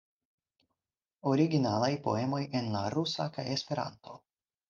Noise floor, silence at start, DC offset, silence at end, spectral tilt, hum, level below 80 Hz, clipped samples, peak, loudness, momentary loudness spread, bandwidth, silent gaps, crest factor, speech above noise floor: under -90 dBFS; 1.25 s; under 0.1%; 0.5 s; -6 dB/octave; none; -74 dBFS; under 0.1%; -14 dBFS; -32 LUFS; 9 LU; 7.6 kHz; none; 20 dB; over 59 dB